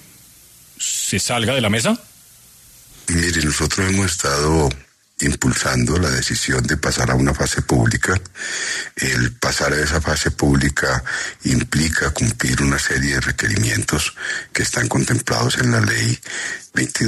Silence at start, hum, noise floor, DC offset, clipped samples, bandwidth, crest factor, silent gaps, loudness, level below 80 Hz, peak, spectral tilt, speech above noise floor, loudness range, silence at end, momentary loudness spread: 0.8 s; none; -47 dBFS; under 0.1%; under 0.1%; 14 kHz; 16 dB; none; -18 LUFS; -34 dBFS; -4 dBFS; -4 dB/octave; 28 dB; 1 LU; 0 s; 6 LU